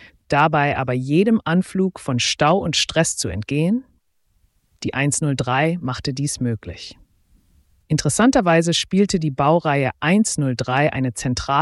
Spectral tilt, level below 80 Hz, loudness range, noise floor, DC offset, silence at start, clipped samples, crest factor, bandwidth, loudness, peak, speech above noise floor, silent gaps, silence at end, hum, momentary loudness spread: -4.5 dB/octave; -46 dBFS; 5 LU; -63 dBFS; under 0.1%; 0 s; under 0.1%; 16 dB; 12 kHz; -19 LUFS; -4 dBFS; 44 dB; none; 0 s; none; 8 LU